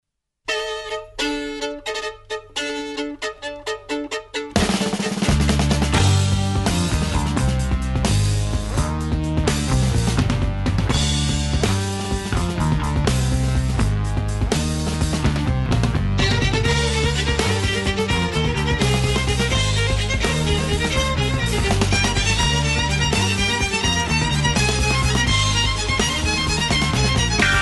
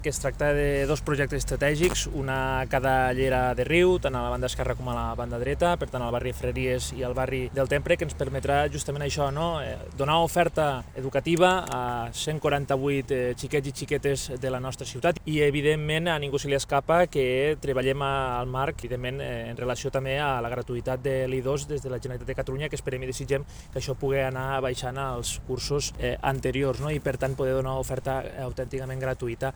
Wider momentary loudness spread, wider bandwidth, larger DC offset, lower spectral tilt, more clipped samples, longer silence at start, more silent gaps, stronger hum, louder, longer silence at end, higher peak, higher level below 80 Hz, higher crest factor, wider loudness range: about the same, 8 LU vs 8 LU; second, 12 kHz vs over 20 kHz; neither; about the same, -4.5 dB/octave vs -5 dB/octave; neither; first, 0.5 s vs 0 s; neither; neither; first, -20 LUFS vs -27 LUFS; about the same, 0 s vs 0 s; first, -2 dBFS vs -6 dBFS; first, -26 dBFS vs -40 dBFS; about the same, 18 dB vs 20 dB; about the same, 5 LU vs 5 LU